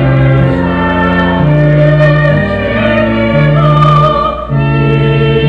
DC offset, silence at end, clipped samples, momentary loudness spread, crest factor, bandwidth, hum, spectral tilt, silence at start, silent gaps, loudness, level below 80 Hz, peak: under 0.1%; 0 s; 0.4%; 4 LU; 8 dB; 5 kHz; none; -9 dB/octave; 0 s; none; -9 LUFS; -24 dBFS; 0 dBFS